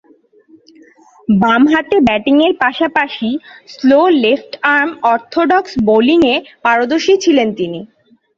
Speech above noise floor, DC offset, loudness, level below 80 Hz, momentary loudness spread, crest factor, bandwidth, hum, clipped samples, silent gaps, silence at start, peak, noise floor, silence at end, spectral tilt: 36 dB; under 0.1%; -13 LUFS; -50 dBFS; 8 LU; 12 dB; 7.4 kHz; none; under 0.1%; none; 1.3 s; -2 dBFS; -48 dBFS; 0.55 s; -5.5 dB/octave